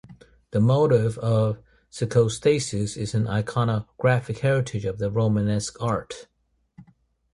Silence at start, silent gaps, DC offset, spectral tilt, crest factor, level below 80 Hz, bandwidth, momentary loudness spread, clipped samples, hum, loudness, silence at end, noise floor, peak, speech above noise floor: 0.1 s; none; under 0.1%; -6.5 dB/octave; 18 dB; -50 dBFS; 11.5 kHz; 9 LU; under 0.1%; none; -24 LUFS; 0.5 s; -61 dBFS; -6 dBFS; 38 dB